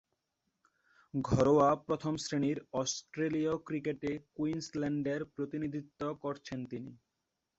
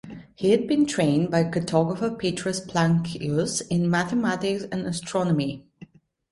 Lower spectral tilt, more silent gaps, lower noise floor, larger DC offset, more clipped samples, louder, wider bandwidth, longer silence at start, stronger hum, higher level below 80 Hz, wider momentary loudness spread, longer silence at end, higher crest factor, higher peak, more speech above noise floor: about the same, -5.5 dB/octave vs -5.5 dB/octave; neither; first, -86 dBFS vs -49 dBFS; neither; neither; second, -34 LUFS vs -24 LUFS; second, 8.2 kHz vs 11.5 kHz; first, 1.15 s vs 0.05 s; neither; about the same, -62 dBFS vs -58 dBFS; first, 14 LU vs 7 LU; first, 0.65 s vs 0.5 s; about the same, 20 dB vs 18 dB; second, -14 dBFS vs -6 dBFS; first, 52 dB vs 26 dB